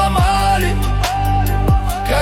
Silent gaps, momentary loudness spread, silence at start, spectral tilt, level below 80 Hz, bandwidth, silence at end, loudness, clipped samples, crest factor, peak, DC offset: none; 4 LU; 0 s; -5.5 dB/octave; -20 dBFS; 16.5 kHz; 0 s; -16 LUFS; under 0.1%; 10 dB; -4 dBFS; under 0.1%